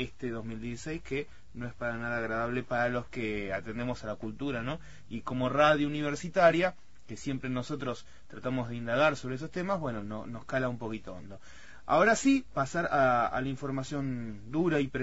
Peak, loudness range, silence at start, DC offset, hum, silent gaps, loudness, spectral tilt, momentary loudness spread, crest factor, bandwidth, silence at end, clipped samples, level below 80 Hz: -10 dBFS; 5 LU; 0 s; 0.5%; none; none; -31 LUFS; -5.5 dB/octave; 16 LU; 20 dB; 8 kHz; 0 s; under 0.1%; -56 dBFS